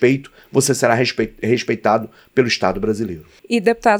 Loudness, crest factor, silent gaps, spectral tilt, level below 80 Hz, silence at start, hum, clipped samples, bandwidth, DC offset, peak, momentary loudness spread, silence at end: -18 LUFS; 16 dB; none; -4.5 dB/octave; -48 dBFS; 0 s; none; under 0.1%; 19.5 kHz; under 0.1%; -2 dBFS; 7 LU; 0 s